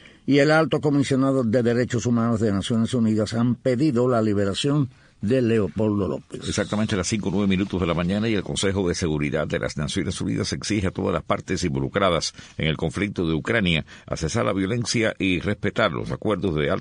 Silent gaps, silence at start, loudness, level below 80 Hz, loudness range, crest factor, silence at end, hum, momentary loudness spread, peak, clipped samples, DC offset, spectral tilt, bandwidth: none; 0.05 s; -23 LUFS; -46 dBFS; 3 LU; 16 dB; 0 s; none; 6 LU; -6 dBFS; under 0.1%; under 0.1%; -5.5 dB/octave; 10 kHz